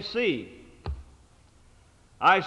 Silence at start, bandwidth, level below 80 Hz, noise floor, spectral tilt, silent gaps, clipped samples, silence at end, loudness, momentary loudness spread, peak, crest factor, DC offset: 0 s; 11 kHz; -46 dBFS; -57 dBFS; -5.5 dB/octave; none; under 0.1%; 0 s; -28 LUFS; 20 LU; -8 dBFS; 22 dB; under 0.1%